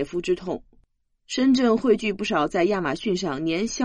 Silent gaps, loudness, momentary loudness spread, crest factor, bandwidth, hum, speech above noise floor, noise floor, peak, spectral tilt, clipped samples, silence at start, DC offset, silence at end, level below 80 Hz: none; -23 LUFS; 8 LU; 16 dB; 10 kHz; none; 41 dB; -64 dBFS; -8 dBFS; -5 dB/octave; under 0.1%; 0 s; under 0.1%; 0 s; -52 dBFS